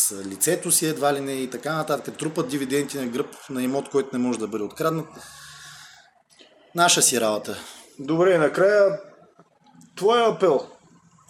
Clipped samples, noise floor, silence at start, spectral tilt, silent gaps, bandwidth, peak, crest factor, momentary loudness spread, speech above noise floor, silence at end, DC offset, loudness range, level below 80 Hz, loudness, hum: under 0.1%; -56 dBFS; 0 s; -3 dB/octave; none; 17.5 kHz; -2 dBFS; 22 dB; 20 LU; 33 dB; 0.55 s; under 0.1%; 7 LU; -70 dBFS; -22 LUFS; none